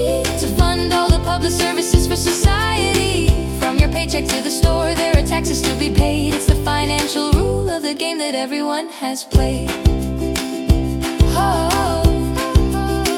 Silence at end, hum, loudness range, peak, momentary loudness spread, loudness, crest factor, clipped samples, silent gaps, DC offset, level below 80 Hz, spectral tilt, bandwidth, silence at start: 0 s; none; 3 LU; -2 dBFS; 5 LU; -17 LUFS; 14 dB; under 0.1%; none; under 0.1%; -22 dBFS; -5 dB/octave; 17.5 kHz; 0 s